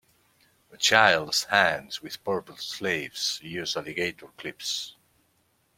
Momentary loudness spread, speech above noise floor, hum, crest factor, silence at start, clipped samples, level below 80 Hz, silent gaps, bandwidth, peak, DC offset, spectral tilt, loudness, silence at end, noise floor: 16 LU; 42 dB; none; 26 dB; 0.75 s; under 0.1%; -68 dBFS; none; 16.5 kHz; -2 dBFS; under 0.1%; -1.5 dB/octave; -25 LUFS; 0.85 s; -69 dBFS